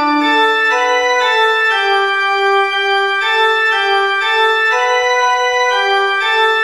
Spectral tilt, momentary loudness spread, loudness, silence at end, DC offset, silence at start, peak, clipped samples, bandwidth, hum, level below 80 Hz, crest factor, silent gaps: 0 dB/octave; 2 LU; -12 LUFS; 0 s; 0.4%; 0 s; -2 dBFS; under 0.1%; 16 kHz; none; -64 dBFS; 10 dB; none